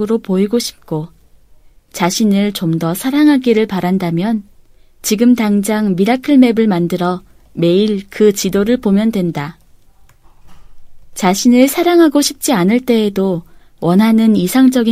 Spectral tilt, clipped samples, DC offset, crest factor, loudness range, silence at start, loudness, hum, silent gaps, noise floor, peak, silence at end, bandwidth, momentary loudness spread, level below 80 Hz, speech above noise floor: -5.5 dB/octave; under 0.1%; under 0.1%; 14 dB; 4 LU; 0 s; -13 LUFS; none; none; -45 dBFS; 0 dBFS; 0 s; 16 kHz; 12 LU; -46 dBFS; 32 dB